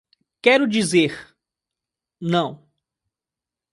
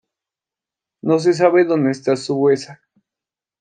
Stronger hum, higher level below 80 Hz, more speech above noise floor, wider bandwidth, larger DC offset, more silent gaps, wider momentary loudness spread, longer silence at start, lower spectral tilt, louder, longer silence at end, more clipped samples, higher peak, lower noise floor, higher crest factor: neither; first, -66 dBFS vs -72 dBFS; about the same, 70 dB vs 72 dB; first, 11.5 kHz vs 9.4 kHz; neither; neither; first, 14 LU vs 8 LU; second, 0.45 s vs 1.05 s; second, -4.5 dB/octave vs -6.5 dB/octave; about the same, -19 LUFS vs -17 LUFS; first, 1.15 s vs 0.85 s; neither; about the same, -2 dBFS vs -2 dBFS; about the same, -88 dBFS vs -88 dBFS; about the same, 22 dB vs 18 dB